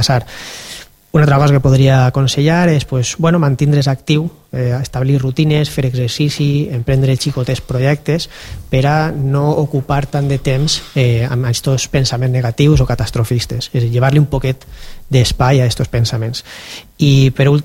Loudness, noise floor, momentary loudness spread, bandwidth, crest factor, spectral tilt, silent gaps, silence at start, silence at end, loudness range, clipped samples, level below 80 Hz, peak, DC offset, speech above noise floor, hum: -14 LUFS; -34 dBFS; 10 LU; 16 kHz; 14 dB; -6 dB/octave; none; 0 s; 0 s; 3 LU; under 0.1%; -32 dBFS; 0 dBFS; under 0.1%; 21 dB; none